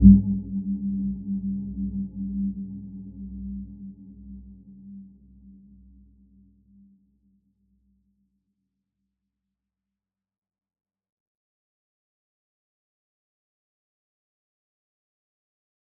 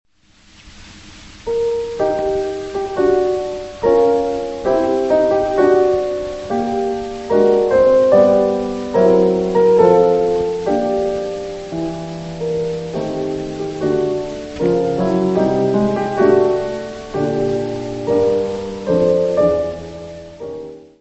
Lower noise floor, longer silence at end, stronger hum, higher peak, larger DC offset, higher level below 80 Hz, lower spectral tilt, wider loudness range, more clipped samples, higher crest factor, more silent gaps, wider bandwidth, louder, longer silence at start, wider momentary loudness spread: first, under -90 dBFS vs -51 dBFS; first, 10.5 s vs 0.15 s; neither; about the same, -2 dBFS vs 0 dBFS; second, under 0.1% vs 0.1%; first, -38 dBFS vs -44 dBFS; first, -19 dB/octave vs -7 dB/octave; first, 21 LU vs 7 LU; neither; first, 28 dB vs 16 dB; neither; second, 0.9 kHz vs 8.4 kHz; second, -27 LUFS vs -17 LUFS; second, 0 s vs 0.65 s; first, 17 LU vs 12 LU